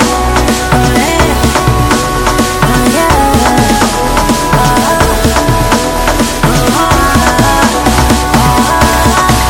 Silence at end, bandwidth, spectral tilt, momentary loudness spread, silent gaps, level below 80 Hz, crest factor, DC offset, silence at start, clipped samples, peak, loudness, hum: 0 s; 18.5 kHz; -4.5 dB/octave; 2 LU; none; -16 dBFS; 8 dB; under 0.1%; 0 s; 0.8%; 0 dBFS; -9 LUFS; none